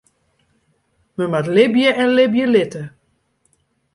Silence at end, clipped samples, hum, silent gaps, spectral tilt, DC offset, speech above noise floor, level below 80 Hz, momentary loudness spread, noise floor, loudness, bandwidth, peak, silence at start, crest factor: 1.05 s; under 0.1%; none; none; -6 dB/octave; under 0.1%; 49 dB; -62 dBFS; 18 LU; -64 dBFS; -16 LUFS; 11.5 kHz; -2 dBFS; 1.2 s; 16 dB